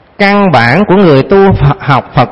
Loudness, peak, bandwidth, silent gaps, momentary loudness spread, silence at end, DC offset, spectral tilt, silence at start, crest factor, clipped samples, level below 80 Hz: -7 LUFS; 0 dBFS; 8 kHz; none; 4 LU; 0 s; under 0.1%; -8.5 dB/octave; 0.2 s; 6 dB; 1%; -28 dBFS